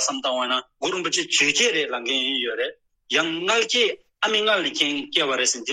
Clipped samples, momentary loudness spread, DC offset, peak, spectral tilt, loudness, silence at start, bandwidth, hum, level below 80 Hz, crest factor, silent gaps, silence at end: under 0.1%; 7 LU; under 0.1%; -2 dBFS; -0.5 dB/octave; -21 LUFS; 0 s; 13 kHz; none; -72 dBFS; 20 dB; none; 0 s